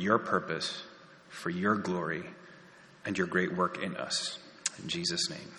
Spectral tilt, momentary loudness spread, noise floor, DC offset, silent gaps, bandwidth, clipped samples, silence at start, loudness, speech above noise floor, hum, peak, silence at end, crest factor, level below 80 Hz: -3.5 dB/octave; 14 LU; -55 dBFS; under 0.1%; none; 11 kHz; under 0.1%; 0 s; -33 LUFS; 23 dB; none; -10 dBFS; 0 s; 24 dB; -72 dBFS